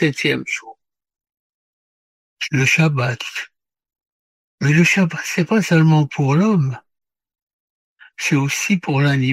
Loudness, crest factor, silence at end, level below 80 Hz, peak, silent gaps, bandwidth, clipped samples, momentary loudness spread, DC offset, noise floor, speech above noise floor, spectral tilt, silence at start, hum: -17 LUFS; 16 dB; 0 s; -58 dBFS; -2 dBFS; 1.39-2.37 s, 4.07-4.58 s, 7.42-7.47 s, 7.53-7.96 s; 14.5 kHz; under 0.1%; 12 LU; under 0.1%; under -90 dBFS; over 73 dB; -5.5 dB/octave; 0 s; none